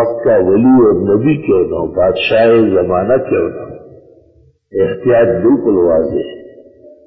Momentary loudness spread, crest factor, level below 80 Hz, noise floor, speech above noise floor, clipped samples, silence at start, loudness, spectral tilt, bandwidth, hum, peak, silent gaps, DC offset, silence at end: 10 LU; 10 dB; -40 dBFS; -49 dBFS; 38 dB; under 0.1%; 0 s; -12 LUFS; -10.5 dB/octave; 5.8 kHz; none; -2 dBFS; none; under 0.1%; 0.2 s